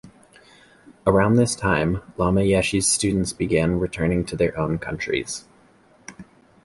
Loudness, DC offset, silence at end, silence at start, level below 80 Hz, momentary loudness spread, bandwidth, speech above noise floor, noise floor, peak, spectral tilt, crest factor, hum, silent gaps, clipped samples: -21 LUFS; under 0.1%; 0.4 s; 0.05 s; -40 dBFS; 8 LU; 11.5 kHz; 34 dB; -55 dBFS; -4 dBFS; -5 dB/octave; 18 dB; none; none; under 0.1%